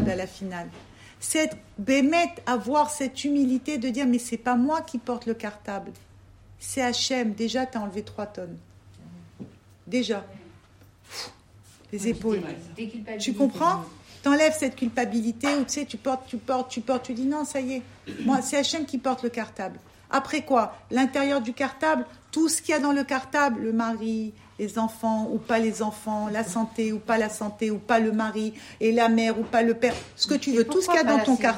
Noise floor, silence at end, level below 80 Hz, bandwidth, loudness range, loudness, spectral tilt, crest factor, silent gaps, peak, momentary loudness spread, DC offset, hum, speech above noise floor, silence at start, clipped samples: -54 dBFS; 0 s; -60 dBFS; 16 kHz; 8 LU; -26 LUFS; -4 dB/octave; 18 dB; none; -8 dBFS; 14 LU; under 0.1%; none; 29 dB; 0 s; under 0.1%